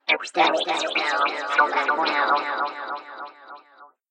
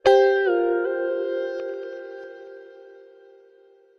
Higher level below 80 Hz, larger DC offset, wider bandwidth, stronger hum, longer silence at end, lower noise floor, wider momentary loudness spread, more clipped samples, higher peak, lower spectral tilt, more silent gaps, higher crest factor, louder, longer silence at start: second, -86 dBFS vs -66 dBFS; neither; first, 10 kHz vs 7 kHz; neither; second, 0.25 s vs 1.1 s; about the same, -52 dBFS vs -55 dBFS; second, 14 LU vs 23 LU; neither; about the same, -6 dBFS vs -4 dBFS; second, -1 dB/octave vs -4.5 dB/octave; neither; about the same, 18 dB vs 20 dB; about the same, -22 LUFS vs -23 LUFS; about the same, 0.05 s vs 0.05 s